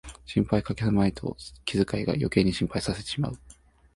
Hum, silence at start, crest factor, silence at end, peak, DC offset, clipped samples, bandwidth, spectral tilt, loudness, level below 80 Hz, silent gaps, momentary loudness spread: none; 0.05 s; 20 dB; 0.45 s; -6 dBFS; under 0.1%; under 0.1%; 11.5 kHz; -6.5 dB/octave; -27 LUFS; -46 dBFS; none; 11 LU